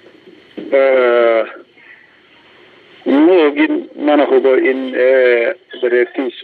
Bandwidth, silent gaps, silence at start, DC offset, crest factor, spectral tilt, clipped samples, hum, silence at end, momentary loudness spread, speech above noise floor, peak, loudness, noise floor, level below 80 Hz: 4.6 kHz; none; 0.55 s; under 0.1%; 12 dB; -6.5 dB/octave; under 0.1%; none; 0 s; 9 LU; 34 dB; -2 dBFS; -13 LUFS; -47 dBFS; -70 dBFS